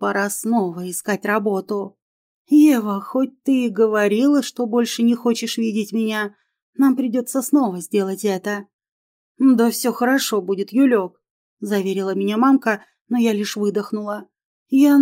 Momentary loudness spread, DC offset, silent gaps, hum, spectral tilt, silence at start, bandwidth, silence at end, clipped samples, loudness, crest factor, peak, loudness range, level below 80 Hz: 10 LU; under 0.1%; 2.02-2.45 s, 6.62-6.73 s, 8.73-8.79 s, 8.92-9.35 s, 11.30-11.57 s, 13.01-13.05 s, 14.45-14.66 s; none; -5 dB/octave; 0 s; 16 kHz; 0 s; under 0.1%; -19 LUFS; 14 dB; -4 dBFS; 3 LU; -78 dBFS